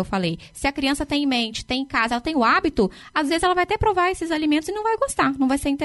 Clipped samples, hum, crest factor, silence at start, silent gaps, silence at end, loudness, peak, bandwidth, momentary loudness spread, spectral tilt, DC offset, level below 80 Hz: under 0.1%; none; 14 dB; 0 s; none; 0 s; -22 LUFS; -6 dBFS; 11.5 kHz; 6 LU; -4.5 dB/octave; under 0.1%; -42 dBFS